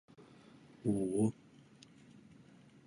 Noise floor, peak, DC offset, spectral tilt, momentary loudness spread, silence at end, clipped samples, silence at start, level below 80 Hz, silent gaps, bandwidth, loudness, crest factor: -61 dBFS; -20 dBFS; under 0.1%; -8 dB/octave; 26 LU; 1.55 s; under 0.1%; 0.2 s; -70 dBFS; none; 11.5 kHz; -36 LUFS; 20 dB